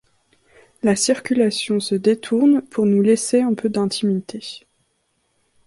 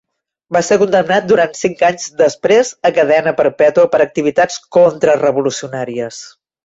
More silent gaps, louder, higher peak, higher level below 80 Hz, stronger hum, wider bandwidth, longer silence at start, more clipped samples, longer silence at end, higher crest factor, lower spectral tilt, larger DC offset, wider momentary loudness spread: neither; second, -19 LUFS vs -13 LUFS; second, -4 dBFS vs 0 dBFS; second, -62 dBFS vs -56 dBFS; neither; first, 11.5 kHz vs 8 kHz; first, 0.85 s vs 0.5 s; neither; first, 1.1 s vs 0.35 s; about the same, 16 dB vs 12 dB; about the same, -5 dB/octave vs -4.5 dB/octave; neither; about the same, 9 LU vs 10 LU